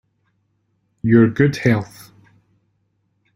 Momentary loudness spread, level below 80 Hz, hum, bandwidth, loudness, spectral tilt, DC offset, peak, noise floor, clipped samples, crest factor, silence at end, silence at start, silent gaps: 12 LU; -54 dBFS; none; 15.5 kHz; -17 LUFS; -8 dB/octave; under 0.1%; -2 dBFS; -67 dBFS; under 0.1%; 18 dB; 1.5 s; 1.05 s; none